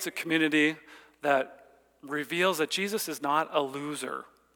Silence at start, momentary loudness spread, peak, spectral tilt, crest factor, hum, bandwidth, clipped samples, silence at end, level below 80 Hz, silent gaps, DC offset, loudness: 0 s; 12 LU; -10 dBFS; -3.5 dB/octave; 20 dB; none; 19.5 kHz; under 0.1%; 0.3 s; -78 dBFS; none; under 0.1%; -29 LUFS